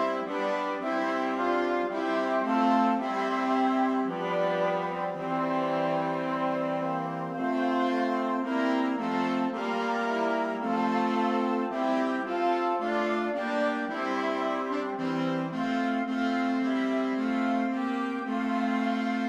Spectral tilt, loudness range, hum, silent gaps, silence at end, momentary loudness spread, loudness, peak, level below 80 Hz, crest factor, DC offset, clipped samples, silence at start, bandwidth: -6 dB/octave; 2 LU; none; none; 0 s; 4 LU; -28 LUFS; -14 dBFS; -72 dBFS; 14 dB; under 0.1%; under 0.1%; 0 s; 8.8 kHz